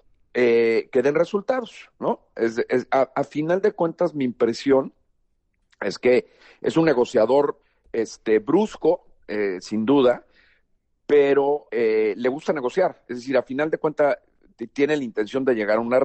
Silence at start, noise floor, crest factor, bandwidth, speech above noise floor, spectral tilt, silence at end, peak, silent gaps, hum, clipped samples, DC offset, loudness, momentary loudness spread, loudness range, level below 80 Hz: 0.35 s; -69 dBFS; 14 dB; 8.6 kHz; 47 dB; -6 dB/octave; 0 s; -8 dBFS; none; none; under 0.1%; under 0.1%; -22 LUFS; 10 LU; 2 LU; -62 dBFS